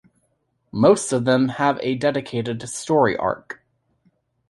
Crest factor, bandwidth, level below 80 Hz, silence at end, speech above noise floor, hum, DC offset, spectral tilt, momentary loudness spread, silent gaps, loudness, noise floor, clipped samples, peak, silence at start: 20 dB; 11.5 kHz; -58 dBFS; 0.95 s; 49 dB; none; under 0.1%; -5.5 dB/octave; 14 LU; none; -20 LUFS; -69 dBFS; under 0.1%; -2 dBFS; 0.75 s